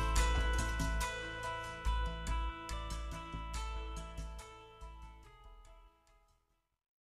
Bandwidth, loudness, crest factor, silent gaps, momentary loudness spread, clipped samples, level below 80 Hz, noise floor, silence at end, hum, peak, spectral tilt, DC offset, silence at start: 14 kHz; -40 LUFS; 20 dB; none; 20 LU; under 0.1%; -40 dBFS; -79 dBFS; 1.25 s; none; -20 dBFS; -4 dB/octave; under 0.1%; 0 s